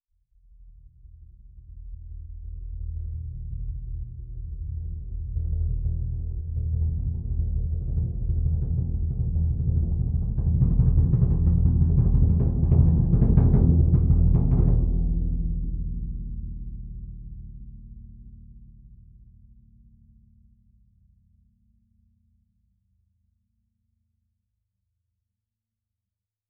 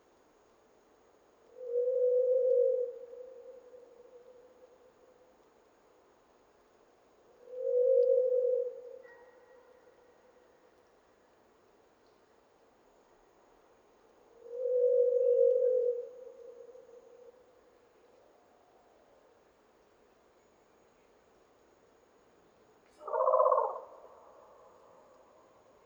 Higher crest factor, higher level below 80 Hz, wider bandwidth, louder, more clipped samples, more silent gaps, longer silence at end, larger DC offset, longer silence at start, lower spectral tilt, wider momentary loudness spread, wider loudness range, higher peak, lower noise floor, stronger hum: about the same, 20 dB vs 22 dB; first, -28 dBFS vs -84 dBFS; second, 1.7 kHz vs 2.6 kHz; first, -25 LUFS vs -30 LUFS; neither; neither; first, 7.55 s vs 1.9 s; neither; second, 0.6 s vs 1.6 s; first, -15 dB/octave vs -5 dB/octave; second, 21 LU vs 27 LU; first, 19 LU vs 11 LU; first, -6 dBFS vs -14 dBFS; first, -87 dBFS vs -66 dBFS; neither